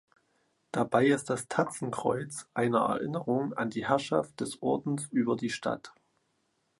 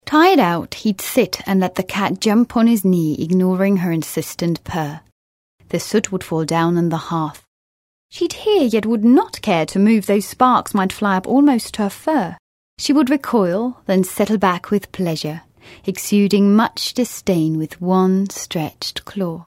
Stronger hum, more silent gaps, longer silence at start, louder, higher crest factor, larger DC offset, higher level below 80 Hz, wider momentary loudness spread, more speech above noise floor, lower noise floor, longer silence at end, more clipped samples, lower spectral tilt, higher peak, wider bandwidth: neither; second, none vs 5.12-5.58 s, 7.47-8.09 s, 12.39-12.77 s; first, 0.75 s vs 0.05 s; second, -30 LUFS vs -18 LUFS; about the same, 20 dB vs 18 dB; neither; second, -70 dBFS vs -52 dBFS; about the same, 8 LU vs 10 LU; second, 46 dB vs over 73 dB; second, -76 dBFS vs under -90 dBFS; first, 0.9 s vs 0.05 s; neither; about the same, -5.5 dB/octave vs -5.5 dB/octave; second, -10 dBFS vs 0 dBFS; second, 11.5 kHz vs 16 kHz